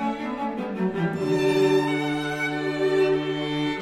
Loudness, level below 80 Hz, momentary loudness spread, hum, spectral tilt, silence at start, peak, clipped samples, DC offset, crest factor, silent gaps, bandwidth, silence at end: -24 LUFS; -58 dBFS; 8 LU; none; -6 dB/octave; 0 s; -10 dBFS; under 0.1%; under 0.1%; 14 dB; none; 15 kHz; 0 s